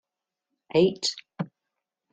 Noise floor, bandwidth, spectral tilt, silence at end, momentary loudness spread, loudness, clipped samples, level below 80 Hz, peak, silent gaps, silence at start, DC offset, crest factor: -86 dBFS; 9.4 kHz; -5 dB/octave; 0.65 s; 14 LU; -25 LUFS; under 0.1%; -70 dBFS; -10 dBFS; none; 0.75 s; under 0.1%; 20 dB